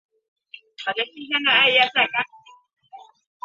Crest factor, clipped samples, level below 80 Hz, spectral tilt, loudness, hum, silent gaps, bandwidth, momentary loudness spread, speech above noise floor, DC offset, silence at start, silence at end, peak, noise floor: 22 dB; under 0.1%; -76 dBFS; -3 dB/octave; -19 LUFS; none; none; 7.6 kHz; 14 LU; 27 dB; under 0.1%; 0.8 s; 0.45 s; -2 dBFS; -47 dBFS